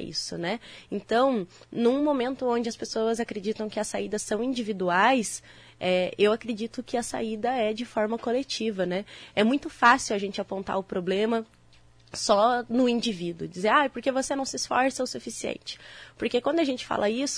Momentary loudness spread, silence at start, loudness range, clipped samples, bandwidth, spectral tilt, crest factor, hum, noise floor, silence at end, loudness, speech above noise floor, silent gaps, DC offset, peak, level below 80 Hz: 11 LU; 0 s; 2 LU; under 0.1%; 11 kHz; -4 dB/octave; 20 dB; none; -56 dBFS; 0 s; -27 LUFS; 29 dB; none; under 0.1%; -6 dBFS; -60 dBFS